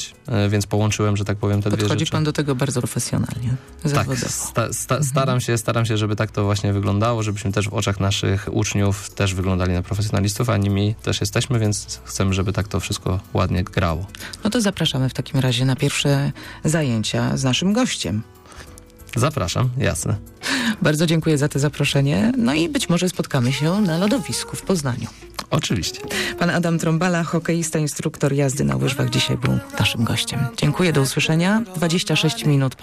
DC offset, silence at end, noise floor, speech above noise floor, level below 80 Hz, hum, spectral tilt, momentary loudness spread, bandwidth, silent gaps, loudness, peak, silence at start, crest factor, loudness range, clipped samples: under 0.1%; 0 s; -42 dBFS; 22 dB; -44 dBFS; none; -5 dB/octave; 5 LU; 15.5 kHz; none; -21 LUFS; -10 dBFS; 0 s; 12 dB; 3 LU; under 0.1%